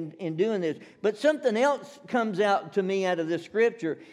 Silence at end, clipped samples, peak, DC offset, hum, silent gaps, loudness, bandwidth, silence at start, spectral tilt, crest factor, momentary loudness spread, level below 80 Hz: 0.05 s; under 0.1%; -12 dBFS; under 0.1%; none; none; -27 LUFS; 11.5 kHz; 0 s; -5.5 dB/octave; 16 dB; 7 LU; -84 dBFS